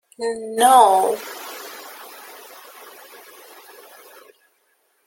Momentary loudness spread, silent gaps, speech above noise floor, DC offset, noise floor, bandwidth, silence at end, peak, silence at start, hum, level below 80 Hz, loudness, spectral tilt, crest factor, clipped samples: 28 LU; none; 49 dB; under 0.1%; -65 dBFS; 17 kHz; 3 s; -2 dBFS; 0.2 s; none; -76 dBFS; -16 LUFS; -1.5 dB/octave; 20 dB; under 0.1%